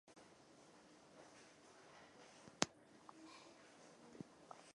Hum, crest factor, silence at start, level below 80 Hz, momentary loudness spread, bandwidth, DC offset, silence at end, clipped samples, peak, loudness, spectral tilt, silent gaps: none; 46 dB; 0.05 s; -86 dBFS; 22 LU; 11 kHz; under 0.1%; 0 s; under 0.1%; -10 dBFS; -51 LUFS; -2 dB/octave; none